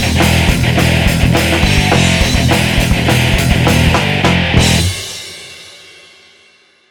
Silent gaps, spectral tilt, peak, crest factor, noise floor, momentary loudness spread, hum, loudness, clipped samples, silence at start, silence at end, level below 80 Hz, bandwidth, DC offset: none; -4.5 dB/octave; 0 dBFS; 12 dB; -48 dBFS; 12 LU; none; -11 LUFS; under 0.1%; 0 s; 1.15 s; -22 dBFS; 19 kHz; under 0.1%